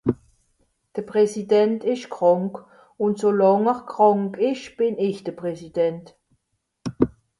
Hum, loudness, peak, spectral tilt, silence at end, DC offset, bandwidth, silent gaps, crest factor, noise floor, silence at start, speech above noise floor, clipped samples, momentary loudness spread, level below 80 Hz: none; -22 LUFS; -4 dBFS; -7 dB/octave; 0.3 s; under 0.1%; 11.5 kHz; none; 20 dB; -75 dBFS; 0.05 s; 54 dB; under 0.1%; 15 LU; -56 dBFS